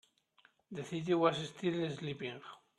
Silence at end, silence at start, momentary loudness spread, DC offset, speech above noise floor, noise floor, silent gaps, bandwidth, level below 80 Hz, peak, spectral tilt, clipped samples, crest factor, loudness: 0.25 s; 0.7 s; 16 LU; under 0.1%; 34 dB; -70 dBFS; none; 11.5 kHz; -78 dBFS; -14 dBFS; -6 dB/octave; under 0.1%; 24 dB; -36 LUFS